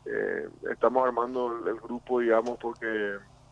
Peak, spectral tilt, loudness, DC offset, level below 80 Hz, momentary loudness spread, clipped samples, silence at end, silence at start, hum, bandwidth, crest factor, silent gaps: -10 dBFS; -6 dB/octave; -29 LUFS; under 0.1%; -62 dBFS; 10 LU; under 0.1%; 0.3 s; 0.05 s; none; 9.8 kHz; 18 dB; none